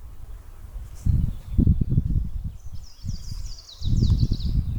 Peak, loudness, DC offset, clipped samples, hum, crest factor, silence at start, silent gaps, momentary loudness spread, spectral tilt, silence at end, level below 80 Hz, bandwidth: -6 dBFS; -26 LUFS; under 0.1%; under 0.1%; none; 18 dB; 0 s; none; 21 LU; -8 dB/octave; 0 s; -28 dBFS; 19.5 kHz